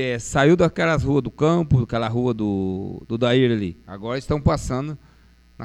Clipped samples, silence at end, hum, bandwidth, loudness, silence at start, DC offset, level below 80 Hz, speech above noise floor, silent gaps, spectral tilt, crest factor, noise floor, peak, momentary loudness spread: under 0.1%; 0 s; none; 12 kHz; -21 LUFS; 0 s; under 0.1%; -38 dBFS; 32 dB; none; -6.5 dB/octave; 18 dB; -52 dBFS; -4 dBFS; 12 LU